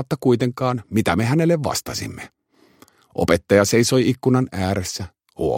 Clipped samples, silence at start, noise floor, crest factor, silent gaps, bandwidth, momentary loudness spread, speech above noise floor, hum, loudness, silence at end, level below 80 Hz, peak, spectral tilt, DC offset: under 0.1%; 0 s; -53 dBFS; 20 dB; none; 16.5 kHz; 16 LU; 34 dB; none; -20 LUFS; 0 s; -48 dBFS; 0 dBFS; -5.5 dB/octave; under 0.1%